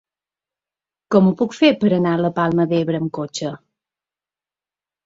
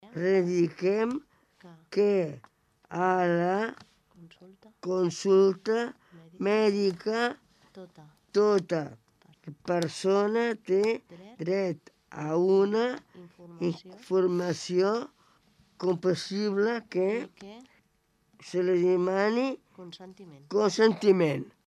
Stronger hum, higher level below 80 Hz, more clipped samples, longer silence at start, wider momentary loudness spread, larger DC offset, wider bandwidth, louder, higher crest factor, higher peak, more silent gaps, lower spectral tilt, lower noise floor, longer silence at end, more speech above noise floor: neither; first, -60 dBFS vs -76 dBFS; neither; first, 1.1 s vs 0.05 s; second, 10 LU vs 18 LU; neither; second, 7.8 kHz vs 11 kHz; first, -18 LUFS vs -27 LUFS; about the same, 18 dB vs 18 dB; first, -2 dBFS vs -10 dBFS; neither; about the same, -6.5 dB/octave vs -6 dB/octave; first, under -90 dBFS vs -71 dBFS; first, 1.5 s vs 0.2 s; first, over 73 dB vs 43 dB